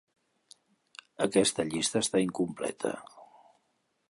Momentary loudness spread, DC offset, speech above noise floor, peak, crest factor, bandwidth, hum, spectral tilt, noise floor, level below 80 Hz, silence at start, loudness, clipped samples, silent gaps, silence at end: 21 LU; under 0.1%; 47 dB; -10 dBFS; 22 dB; 11.5 kHz; none; -3.5 dB/octave; -76 dBFS; -68 dBFS; 1.2 s; -29 LUFS; under 0.1%; none; 0.85 s